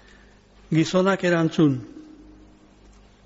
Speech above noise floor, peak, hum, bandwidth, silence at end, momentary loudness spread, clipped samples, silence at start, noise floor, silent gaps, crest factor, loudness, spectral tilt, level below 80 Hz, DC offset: 31 dB; -8 dBFS; none; 8 kHz; 1.25 s; 9 LU; under 0.1%; 0.7 s; -52 dBFS; none; 16 dB; -21 LUFS; -6 dB/octave; -56 dBFS; under 0.1%